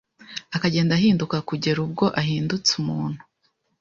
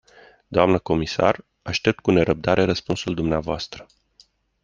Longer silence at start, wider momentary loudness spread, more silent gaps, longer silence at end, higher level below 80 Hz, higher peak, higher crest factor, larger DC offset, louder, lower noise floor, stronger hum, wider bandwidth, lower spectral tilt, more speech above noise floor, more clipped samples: second, 0.2 s vs 0.5 s; about the same, 12 LU vs 10 LU; neither; second, 0.65 s vs 0.8 s; second, -56 dBFS vs -46 dBFS; second, -6 dBFS vs -2 dBFS; about the same, 18 dB vs 22 dB; neither; about the same, -22 LUFS vs -22 LUFS; first, -70 dBFS vs -58 dBFS; neither; about the same, 7.6 kHz vs 7.6 kHz; about the same, -5 dB/octave vs -6 dB/octave; first, 48 dB vs 37 dB; neither